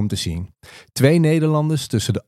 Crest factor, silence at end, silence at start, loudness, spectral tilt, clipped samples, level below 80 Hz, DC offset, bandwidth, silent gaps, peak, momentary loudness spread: 18 dB; 0.05 s; 0 s; -18 LUFS; -6 dB/octave; under 0.1%; -44 dBFS; under 0.1%; 14.5 kHz; none; 0 dBFS; 16 LU